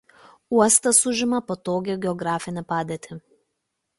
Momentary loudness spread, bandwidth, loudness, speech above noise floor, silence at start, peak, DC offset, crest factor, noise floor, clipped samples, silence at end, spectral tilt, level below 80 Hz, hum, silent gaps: 16 LU; 12 kHz; -21 LUFS; 56 dB; 0.5 s; -2 dBFS; under 0.1%; 22 dB; -78 dBFS; under 0.1%; 0.8 s; -3.5 dB/octave; -62 dBFS; none; none